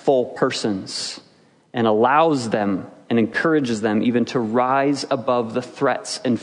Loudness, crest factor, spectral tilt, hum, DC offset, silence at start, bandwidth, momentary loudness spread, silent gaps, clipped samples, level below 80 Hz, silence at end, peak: -20 LUFS; 18 dB; -5 dB/octave; none; under 0.1%; 0 s; 10.5 kHz; 10 LU; none; under 0.1%; -68 dBFS; 0 s; -2 dBFS